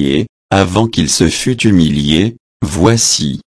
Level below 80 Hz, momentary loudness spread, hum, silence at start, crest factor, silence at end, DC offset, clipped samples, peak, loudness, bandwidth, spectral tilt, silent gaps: -32 dBFS; 7 LU; none; 0 s; 12 dB; 0.1 s; under 0.1%; under 0.1%; 0 dBFS; -12 LUFS; 11 kHz; -4.5 dB/octave; 0.29-0.49 s, 2.40-2.60 s